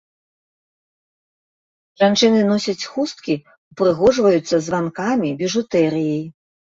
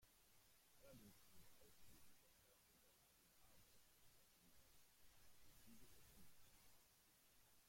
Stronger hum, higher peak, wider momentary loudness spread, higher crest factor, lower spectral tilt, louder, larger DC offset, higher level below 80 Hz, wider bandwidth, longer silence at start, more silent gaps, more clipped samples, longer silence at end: neither; first, -2 dBFS vs -54 dBFS; first, 10 LU vs 2 LU; about the same, 18 dB vs 16 dB; first, -5 dB/octave vs -3 dB/octave; first, -18 LUFS vs -69 LUFS; neither; first, -56 dBFS vs -82 dBFS; second, 8 kHz vs 16.5 kHz; first, 2 s vs 0 s; first, 3.58-3.71 s vs none; neither; first, 0.45 s vs 0 s